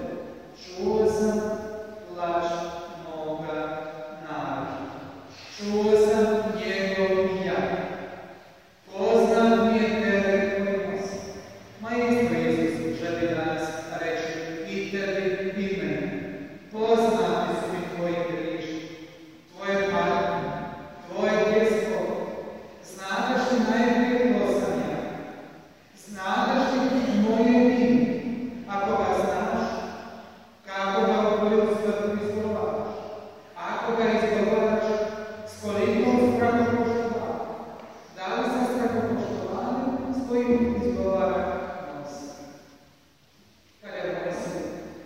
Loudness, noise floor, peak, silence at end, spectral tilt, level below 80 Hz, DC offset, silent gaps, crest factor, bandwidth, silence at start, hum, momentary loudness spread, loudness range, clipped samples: -25 LUFS; -59 dBFS; -8 dBFS; 0 s; -6 dB/octave; -56 dBFS; 0.1%; none; 18 dB; 16 kHz; 0 s; none; 17 LU; 5 LU; under 0.1%